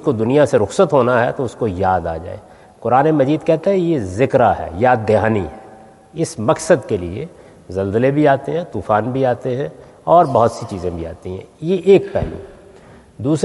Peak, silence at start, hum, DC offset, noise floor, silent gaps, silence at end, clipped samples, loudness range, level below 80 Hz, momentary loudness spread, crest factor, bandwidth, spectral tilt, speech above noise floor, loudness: 0 dBFS; 0 s; none; under 0.1%; -43 dBFS; none; 0 s; under 0.1%; 3 LU; -46 dBFS; 15 LU; 16 dB; 11.5 kHz; -7 dB/octave; 27 dB; -16 LUFS